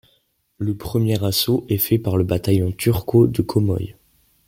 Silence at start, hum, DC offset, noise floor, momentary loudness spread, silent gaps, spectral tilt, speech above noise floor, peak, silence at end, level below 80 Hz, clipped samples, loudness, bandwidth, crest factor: 0.6 s; none; under 0.1%; -64 dBFS; 10 LU; none; -6.5 dB/octave; 46 dB; -4 dBFS; 0.55 s; -46 dBFS; under 0.1%; -20 LUFS; 17 kHz; 16 dB